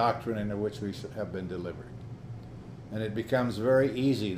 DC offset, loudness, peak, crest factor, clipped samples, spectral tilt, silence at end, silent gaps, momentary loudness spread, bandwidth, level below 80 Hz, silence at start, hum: under 0.1%; -31 LUFS; -14 dBFS; 18 dB; under 0.1%; -7 dB/octave; 0 s; none; 19 LU; 15.5 kHz; -56 dBFS; 0 s; none